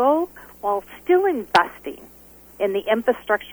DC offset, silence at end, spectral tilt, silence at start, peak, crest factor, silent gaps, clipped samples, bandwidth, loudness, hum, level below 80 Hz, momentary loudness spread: under 0.1%; 0 s; -4.5 dB/octave; 0 s; -2 dBFS; 20 dB; none; under 0.1%; over 20 kHz; -22 LUFS; none; -56 dBFS; 13 LU